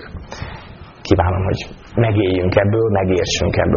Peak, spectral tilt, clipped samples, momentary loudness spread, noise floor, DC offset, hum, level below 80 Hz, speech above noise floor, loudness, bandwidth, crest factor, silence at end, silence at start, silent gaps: -2 dBFS; -5.5 dB/octave; under 0.1%; 16 LU; -37 dBFS; under 0.1%; none; -34 dBFS; 21 dB; -17 LUFS; 7.2 kHz; 16 dB; 0 s; 0 s; none